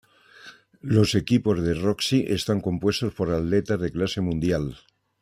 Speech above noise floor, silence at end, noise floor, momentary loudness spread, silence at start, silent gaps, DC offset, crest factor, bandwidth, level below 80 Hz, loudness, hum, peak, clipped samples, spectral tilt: 26 dB; 0.45 s; -49 dBFS; 5 LU; 0.45 s; none; under 0.1%; 18 dB; 15.5 kHz; -48 dBFS; -24 LUFS; none; -6 dBFS; under 0.1%; -6 dB/octave